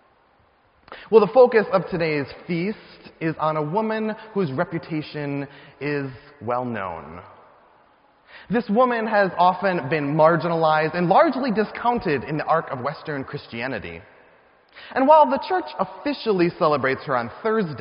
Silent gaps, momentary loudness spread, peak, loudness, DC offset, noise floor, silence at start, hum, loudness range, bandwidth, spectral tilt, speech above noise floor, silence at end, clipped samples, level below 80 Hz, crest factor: none; 14 LU; 0 dBFS; -22 LUFS; under 0.1%; -59 dBFS; 0.9 s; none; 8 LU; 5.4 kHz; -5 dB/octave; 38 dB; 0 s; under 0.1%; -58 dBFS; 22 dB